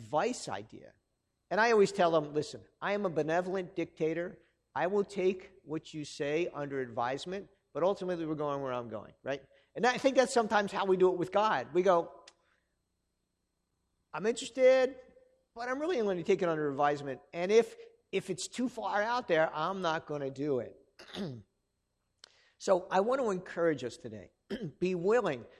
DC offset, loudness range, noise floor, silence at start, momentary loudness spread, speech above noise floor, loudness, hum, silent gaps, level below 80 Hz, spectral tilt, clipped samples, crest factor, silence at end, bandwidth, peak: under 0.1%; 5 LU; -82 dBFS; 0 s; 14 LU; 50 dB; -32 LUFS; none; none; -72 dBFS; -5 dB/octave; under 0.1%; 20 dB; 0.1 s; 11.5 kHz; -12 dBFS